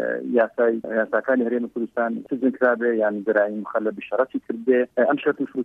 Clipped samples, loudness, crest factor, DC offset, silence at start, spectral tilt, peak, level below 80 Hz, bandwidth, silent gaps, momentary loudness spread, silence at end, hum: under 0.1%; -22 LUFS; 16 dB; under 0.1%; 0 s; -8.5 dB/octave; -6 dBFS; -72 dBFS; 3.9 kHz; none; 6 LU; 0 s; none